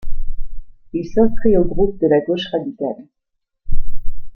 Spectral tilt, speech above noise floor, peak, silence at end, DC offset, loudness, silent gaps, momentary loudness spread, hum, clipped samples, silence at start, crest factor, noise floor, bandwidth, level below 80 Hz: -8 dB/octave; 58 dB; -2 dBFS; 0.05 s; under 0.1%; -18 LUFS; none; 19 LU; none; under 0.1%; 0.05 s; 12 dB; -74 dBFS; 4.3 kHz; -26 dBFS